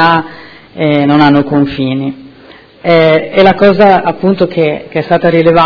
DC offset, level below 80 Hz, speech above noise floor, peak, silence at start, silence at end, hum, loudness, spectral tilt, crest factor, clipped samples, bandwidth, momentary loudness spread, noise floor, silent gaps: under 0.1%; -42 dBFS; 29 dB; 0 dBFS; 0 s; 0 s; none; -9 LUFS; -8.5 dB/octave; 10 dB; 2%; 5.4 kHz; 11 LU; -37 dBFS; none